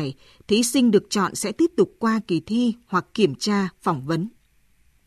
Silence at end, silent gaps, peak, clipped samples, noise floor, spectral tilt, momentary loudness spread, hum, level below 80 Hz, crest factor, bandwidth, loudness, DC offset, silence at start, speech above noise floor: 0.75 s; none; -6 dBFS; under 0.1%; -60 dBFS; -5 dB/octave; 8 LU; none; -60 dBFS; 18 dB; 13.5 kHz; -22 LUFS; under 0.1%; 0 s; 38 dB